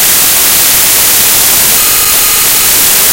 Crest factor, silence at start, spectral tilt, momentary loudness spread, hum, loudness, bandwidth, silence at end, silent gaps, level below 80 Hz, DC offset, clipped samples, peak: 6 dB; 0 s; 0.5 dB/octave; 1 LU; none; -3 LUFS; over 20 kHz; 0 s; none; -34 dBFS; 0.9%; 4%; 0 dBFS